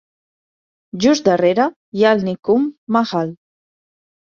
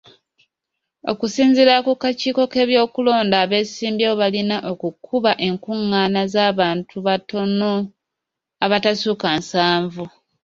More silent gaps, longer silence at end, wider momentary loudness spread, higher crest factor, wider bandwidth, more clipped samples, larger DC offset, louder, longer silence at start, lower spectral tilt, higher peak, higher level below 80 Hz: first, 1.76-1.92 s, 2.39-2.43 s, 2.78-2.87 s vs none; first, 1 s vs 0.35 s; about the same, 7 LU vs 8 LU; about the same, 16 dB vs 18 dB; about the same, 7.6 kHz vs 7.6 kHz; neither; neither; about the same, -17 LUFS vs -18 LUFS; about the same, 0.95 s vs 1.05 s; about the same, -5.5 dB/octave vs -5 dB/octave; about the same, -2 dBFS vs -2 dBFS; about the same, -60 dBFS vs -60 dBFS